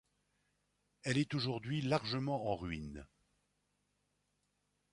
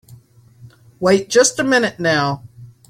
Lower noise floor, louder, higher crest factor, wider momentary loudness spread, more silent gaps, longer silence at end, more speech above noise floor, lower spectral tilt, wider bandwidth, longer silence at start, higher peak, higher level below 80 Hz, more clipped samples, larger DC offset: first, -82 dBFS vs -46 dBFS; second, -38 LUFS vs -16 LUFS; about the same, 20 dB vs 18 dB; about the same, 10 LU vs 8 LU; neither; first, 1.85 s vs 0.25 s; first, 44 dB vs 31 dB; first, -6 dB/octave vs -3.5 dB/octave; second, 11.5 kHz vs 15.5 kHz; first, 1.05 s vs 0.1 s; second, -20 dBFS vs -2 dBFS; second, -62 dBFS vs -56 dBFS; neither; neither